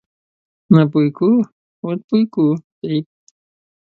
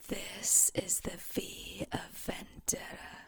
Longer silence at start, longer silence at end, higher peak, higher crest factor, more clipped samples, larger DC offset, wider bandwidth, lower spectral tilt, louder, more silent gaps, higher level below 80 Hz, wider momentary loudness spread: first, 0.7 s vs 0 s; first, 0.75 s vs 0 s; first, 0 dBFS vs -14 dBFS; about the same, 18 dB vs 22 dB; neither; neither; second, 6.8 kHz vs over 20 kHz; first, -10 dB/octave vs -2 dB/octave; first, -17 LUFS vs -32 LUFS; first, 1.52-1.83 s, 2.04-2.08 s, 2.64-2.82 s vs none; about the same, -60 dBFS vs -56 dBFS; second, 12 LU vs 16 LU